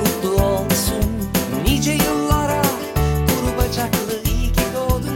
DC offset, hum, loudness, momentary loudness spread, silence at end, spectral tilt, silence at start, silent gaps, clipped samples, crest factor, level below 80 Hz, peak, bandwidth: under 0.1%; none; -19 LUFS; 4 LU; 0 s; -5 dB/octave; 0 s; none; under 0.1%; 16 dB; -26 dBFS; -2 dBFS; 17 kHz